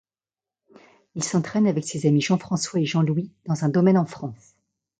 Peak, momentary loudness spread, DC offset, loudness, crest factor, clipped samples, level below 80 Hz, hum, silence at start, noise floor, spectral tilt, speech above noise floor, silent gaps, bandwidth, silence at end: -6 dBFS; 10 LU; under 0.1%; -23 LUFS; 18 dB; under 0.1%; -66 dBFS; none; 1.15 s; under -90 dBFS; -6 dB/octave; over 68 dB; none; 9.4 kHz; 0.65 s